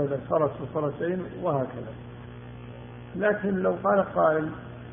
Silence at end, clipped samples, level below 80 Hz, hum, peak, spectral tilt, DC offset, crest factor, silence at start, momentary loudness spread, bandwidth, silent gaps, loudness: 0 s; under 0.1%; -56 dBFS; 60 Hz at -45 dBFS; -10 dBFS; -7 dB/octave; under 0.1%; 18 dB; 0 s; 19 LU; 3.7 kHz; none; -27 LUFS